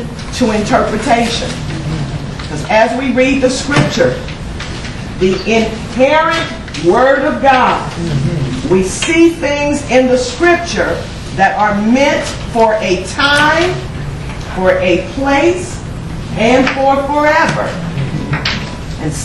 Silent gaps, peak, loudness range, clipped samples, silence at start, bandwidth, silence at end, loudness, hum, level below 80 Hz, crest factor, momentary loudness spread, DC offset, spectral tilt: none; 0 dBFS; 2 LU; under 0.1%; 0 s; 12 kHz; 0 s; -13 LUFS; none; -30 dBFS; 12 dB; 12 LU; under 0.1%; -5 dB/octave